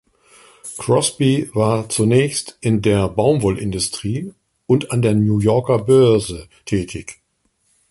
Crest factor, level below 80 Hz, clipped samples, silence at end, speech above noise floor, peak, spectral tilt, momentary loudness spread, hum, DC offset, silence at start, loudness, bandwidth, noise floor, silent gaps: 16 dB; -44 dBFS; under 0.1%; 0.75 s; 49 dB; -2 dBFS; -6 dB/octave; 14 LU; none; under 0.1%; 0.65 s; -17 LUFS; 12 kHz; -66 dBFS; none